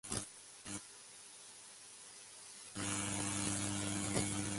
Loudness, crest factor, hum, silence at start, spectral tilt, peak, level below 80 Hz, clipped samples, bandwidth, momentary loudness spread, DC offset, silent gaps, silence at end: -39 LUFS; 22 dB; none; 0.05 s; -3 dB/octave; -20 dBFS; -62 dBFS; under 0.1%; 12 kHz; 16 LU; under 0.1%; none; 0 s